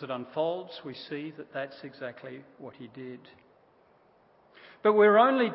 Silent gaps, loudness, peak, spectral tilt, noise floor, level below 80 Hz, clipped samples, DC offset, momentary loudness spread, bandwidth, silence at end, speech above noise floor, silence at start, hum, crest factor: none; -26 LUFS; -8 dBFS; -9 dB/octave; -63 dBFS; -82 dBFS; under 0.1%; under 0.1%; 25 LU; 5.8 kHz; 0 s; 34 dB; 0 s; none; 22 dB